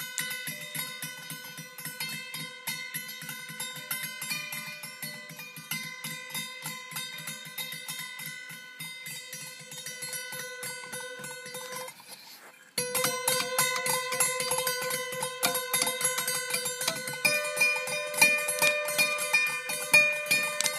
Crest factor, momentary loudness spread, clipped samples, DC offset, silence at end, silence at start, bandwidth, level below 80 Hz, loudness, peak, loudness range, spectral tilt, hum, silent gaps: 26 dB; 15 LU; under 0.1%; under 0.1%; 0 s; 0 s; 15.5 kHz; -82 dBFS; -29 LUFS; -6 dBFS; 12 LU; -0.5 dB/octave; none; none